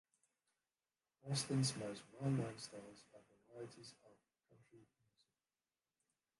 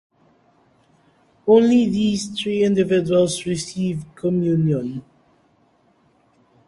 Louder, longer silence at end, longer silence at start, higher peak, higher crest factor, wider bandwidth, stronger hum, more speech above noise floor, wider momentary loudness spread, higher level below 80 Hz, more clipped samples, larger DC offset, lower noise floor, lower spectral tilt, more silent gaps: second, -43 LUFS vs -19 LUFS; about the same, 1.55 s vs 1.65 s; second, 1.25 s vs 1.45 s; second, -28 dBFS vs -4 dBFS; about the same, 20 dB vs 18 dB; about the same, 11.5 kHz vs 11.5 kHz; neither; first, over 47 dB vs 41 dB; first, 21 LU vs 11 LU; second, -80 dBFS vs -56 dBFS; neither; neither; first, under -90 dBFS vs -60 dBFS; about the same, -5 dB/octave vs -6 dB/octave; neither